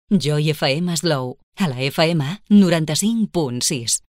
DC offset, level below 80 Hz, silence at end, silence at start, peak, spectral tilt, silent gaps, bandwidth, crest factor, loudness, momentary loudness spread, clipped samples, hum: under 0.1%; -54 dBFS; 0.2 s; 0.1 s; -4 dBFS; -4.5 dB/octave; 1.43-1.52 s; 16 kHz; 16 dB; -19 LUFS; 9 LU; under 0.1%; none